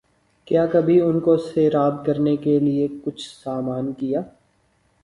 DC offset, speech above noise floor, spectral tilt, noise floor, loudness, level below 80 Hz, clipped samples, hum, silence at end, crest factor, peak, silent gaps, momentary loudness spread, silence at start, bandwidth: under 0.1%; 43 dB; -8.5 dB/octave; -63 dBFS; -21 LUFS; -58 dBFS; under 0.1%; none; 0.75 s; 14 dB; -6 dBFS; none; 12 LU; 0.5 s; 11.5 kHz